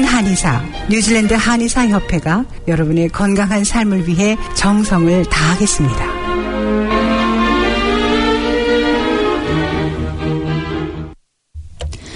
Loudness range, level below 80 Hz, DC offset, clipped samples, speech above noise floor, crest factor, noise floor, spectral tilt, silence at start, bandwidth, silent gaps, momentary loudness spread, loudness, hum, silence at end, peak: 3 LU; -28 dBFS; under 0.1%; under 0.1%; 25 dB; 14 dB; -38 dBFS; -5 dB/octave; 0 s; 11 kHz; none; 7 LU; -15 LUFS; none; 0 s; 0 dBFS